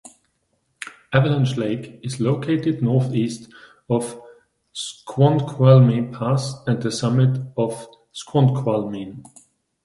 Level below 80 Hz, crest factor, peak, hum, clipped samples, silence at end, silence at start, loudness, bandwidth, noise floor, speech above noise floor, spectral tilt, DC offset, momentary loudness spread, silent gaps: -58 dBFS; 20 dB; 0 dBFS; none; under 0.1%; 0.65 s; 0.8 s; -20 LUFS; 11.5 kHz; -69 dBFS; 50 dB; -7 dB/octave; under 0.1%; 18 LU; none